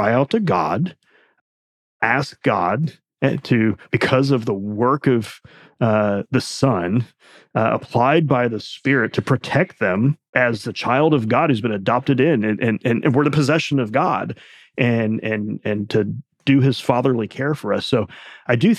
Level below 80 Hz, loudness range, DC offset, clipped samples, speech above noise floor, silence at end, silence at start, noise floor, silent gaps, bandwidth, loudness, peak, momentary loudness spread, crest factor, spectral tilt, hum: -58 dBFS; 3 LU; under 0.1%; under 0.1%; over 71 dB; 0 s; 0 s; under -90 dBFS; 1.41-2.00 s, 10.29-10.33 s; 13 kHz; -19 LUFS; -2 dBFS; 7 LU; 18 dB; -7 dB/octave; none